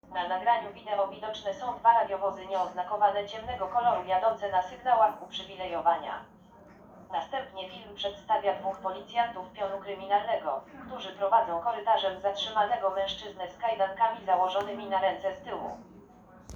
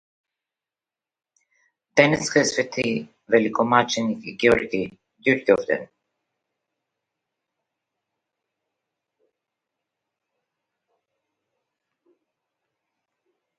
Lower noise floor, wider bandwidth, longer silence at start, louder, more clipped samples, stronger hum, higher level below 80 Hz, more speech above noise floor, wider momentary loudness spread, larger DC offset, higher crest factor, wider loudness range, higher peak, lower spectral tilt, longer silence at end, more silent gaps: second, -54 dBFS vs under -90 dBFS; first, over 20 kHz vs 10.5 kHz; second, 0.1 s vs 1.95 s; second, -30 LUFS vs -21 LUFS; neither; neither; about the same, -64 dBFS vs -60 dBFS; second, 24 dB vs over 69 dB; about the same, 12 LU vs 10 LU; neither; second, 20 dB vs 26 dB; about the same, 5 LU vs 6 LU; second, -10 dBFS vs 0 dBFS; about the same, -4 dB/octave vs -4 dB/octave; second, 0 s vs 7.75 s; neither